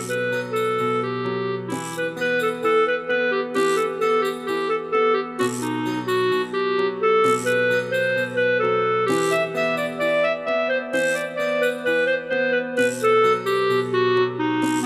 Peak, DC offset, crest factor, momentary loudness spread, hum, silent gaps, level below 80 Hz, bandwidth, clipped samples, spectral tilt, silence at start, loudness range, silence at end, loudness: -8 dBFS; under 0.1%; 14 dB; 5 LU; none; none; -68 dBFS; 15.5 kHz; under 0.1%; -4.5 dB/octave; 0 s; 2 LU; 0 s; -21 LUFS